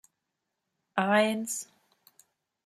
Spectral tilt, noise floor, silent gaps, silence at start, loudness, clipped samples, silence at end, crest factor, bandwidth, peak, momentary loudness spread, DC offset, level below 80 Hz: -3.5 dB/octave; -84 dBFS; none; 0.95 s; -28 LUFS; under 0.1%; 1 s; 24 dB; 15.5 kHz; -10 dBFS; 12 LU; under 0.1%; -82 dBFS